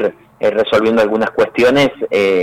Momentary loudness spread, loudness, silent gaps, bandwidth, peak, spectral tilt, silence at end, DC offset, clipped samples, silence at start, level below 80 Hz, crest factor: 5 LU; -14 LUFS; none; 15.5 kHz; -6 dBFS; -5.5 dB/octave; 0 s; under 0.1%; under 0.1%; 0 s; -50 dBFS; 8 dB